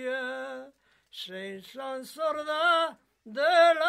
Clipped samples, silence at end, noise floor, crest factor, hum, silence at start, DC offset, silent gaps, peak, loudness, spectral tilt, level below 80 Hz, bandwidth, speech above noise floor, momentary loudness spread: under 0.1%; 0 s; -57 dBFS; 18 dB; none; 0 s; under 0.1%; none; -10 dBFS; -27 LUFS; -2.5 dB/octave; -82 dBFS; 14.5 kHz; 30 dB; 18 LU